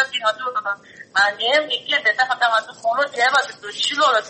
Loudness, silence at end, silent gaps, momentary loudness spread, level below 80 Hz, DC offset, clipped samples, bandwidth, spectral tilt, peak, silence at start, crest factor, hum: -19 LUFS; 0 s; none; 8 LU; -74 dBFS; under 0.1%; under 0.1%; 8.8 kHz; 0 dB/octave; -4 dBFS; 0 s; 16 dB; none